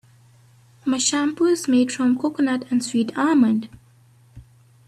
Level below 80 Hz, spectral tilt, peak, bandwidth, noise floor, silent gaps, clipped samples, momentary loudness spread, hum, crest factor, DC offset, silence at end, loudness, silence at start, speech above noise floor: -60 dBFS; -3.5 dB/octave; -6 dBFS; 13 kHz; -53 dBFS; none; under 0.1%; 7 LU; none; 16 dB; under 0.1%; 0.45 s; -20 LUFS; 0.85 s; 34 dB